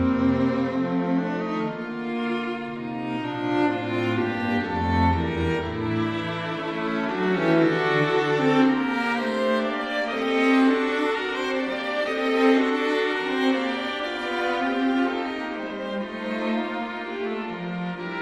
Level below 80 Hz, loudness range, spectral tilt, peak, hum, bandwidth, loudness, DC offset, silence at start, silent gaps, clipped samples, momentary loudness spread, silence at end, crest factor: -50 dBFS; 5 LU; -6.5 dB/octave; -8 dBFS; none; 9.8 kHz; -24 LUFS; under 0.1%; 0 s; none; under 0.1%; 10 LU; 0 s; 16 dB